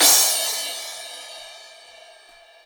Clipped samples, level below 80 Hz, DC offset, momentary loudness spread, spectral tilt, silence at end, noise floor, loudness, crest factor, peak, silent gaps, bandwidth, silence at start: under 0.1%; -74 dBFS; under 0.1%; 24 LU; 3 dB/octave; 0.95 s; -50 dBFS; -19 LUFS; 22 dB; -2 dBFS; none; over 20 kHz; 0 s